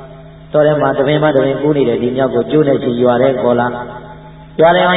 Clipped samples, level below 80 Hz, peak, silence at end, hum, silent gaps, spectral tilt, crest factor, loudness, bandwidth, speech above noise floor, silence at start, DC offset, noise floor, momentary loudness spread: under 0.1%; -44 dBFS; 0 dBFS; 0 s; none; none; -11 dB/octave; 12 dB; -13 LUFS; 4 kHz; 22 dB; 0 s; under 0.1%; -34 dBFS; 8 LU